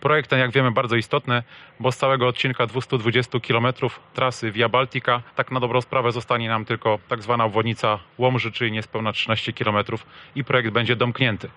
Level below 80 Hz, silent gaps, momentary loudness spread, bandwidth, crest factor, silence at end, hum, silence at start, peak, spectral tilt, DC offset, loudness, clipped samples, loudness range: -60 dBFS; none; 6 LU; 10.5 kHz; 16 dB; 0.05 s; none; 0 s; -6 dBFS; -6 dB/octave; under 0.1%; -22 LUFS; under 0.1%; 1 LU